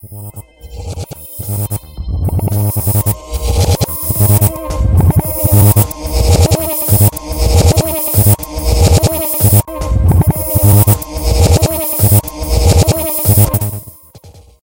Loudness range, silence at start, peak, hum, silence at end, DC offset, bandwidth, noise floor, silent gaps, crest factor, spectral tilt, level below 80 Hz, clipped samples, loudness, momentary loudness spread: 5 LU; 0.05 s; 0 dBFS; none; 0.3 s; under 0.1%; 17 kHz; -38 dBFS; none; 12 dB; -5.5 dB/octave; -20 dBFS; under 0.1%; -12 LUFS; 12 LU